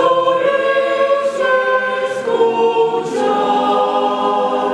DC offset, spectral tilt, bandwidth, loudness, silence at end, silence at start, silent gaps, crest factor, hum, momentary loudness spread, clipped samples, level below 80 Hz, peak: under 0.1%; -4 dB/octave; 11 kHz; -15 LUFS; 0 s; 0 s; none; 14 dB; none; 3 LU; under 0.1%; -60 dBFS; -2 dBFS